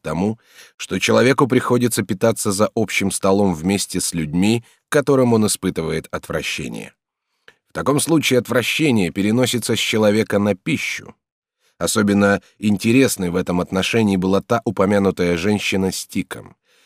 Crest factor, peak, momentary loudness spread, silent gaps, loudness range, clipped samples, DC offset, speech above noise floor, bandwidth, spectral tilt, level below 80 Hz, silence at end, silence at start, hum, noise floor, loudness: 18 dB; -2 dBFS; 9 LU; 0.74-0.78 s, 11.32-11.42 s; 3 LU; under 0.1%; under 0.1%; 56 dB; 16 kHz; -4.5 dB/octave; -50 dBFS; 0.4 s; 0.05 s; none; -74 dBFS; -18 LUFS